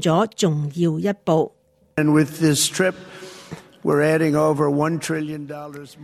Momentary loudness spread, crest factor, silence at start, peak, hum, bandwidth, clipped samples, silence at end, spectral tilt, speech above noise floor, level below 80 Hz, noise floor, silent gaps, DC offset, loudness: 19 LU; 16 dB; 0 s; -4 dBFS; none; 14 kHz; under 0.1%; 0 s; -5 dB/octave; 20 dB; -60 dBFS; -40 dBFS; none; under 0.1%; -20 LUFS